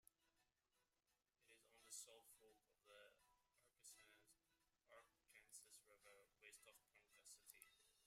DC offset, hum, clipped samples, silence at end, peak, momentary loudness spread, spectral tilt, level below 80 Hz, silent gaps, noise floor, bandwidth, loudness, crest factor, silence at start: under 0.1%; none; under 0.1%; 0 s; -44 dBFS; 11 LU; 1 dB/octave; under -90 dBFS; none; under -90 dBFS; 16 kHz; -65 LUFS; 26 dB; 0.05 s